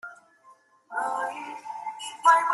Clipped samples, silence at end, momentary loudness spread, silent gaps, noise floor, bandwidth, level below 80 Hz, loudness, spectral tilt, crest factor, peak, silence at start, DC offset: under 0.1%; 0 s; 17 LU; none; -58 dBFS; 12.5 kHz; -88 dBFS; -27 LUFS; -0.5 dB/octave; 22 dB; -6 dBFS; 0.05 s; under 0.1%